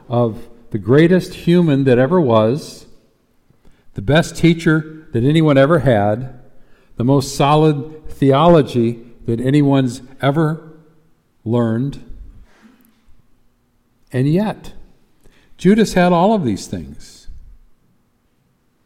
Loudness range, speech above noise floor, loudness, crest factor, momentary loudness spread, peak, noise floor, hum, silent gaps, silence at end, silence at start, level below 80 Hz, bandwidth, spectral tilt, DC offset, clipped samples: 9 LU; 46 dB; -15 LUFS; 16 dB; 17 LU; -2 dBFS; -60 dBFS; none; none; 1.45 s; 0.1 s; -42 dBFS; 15 kHz; -7 dB/octave; under 0.1%; under 0.1%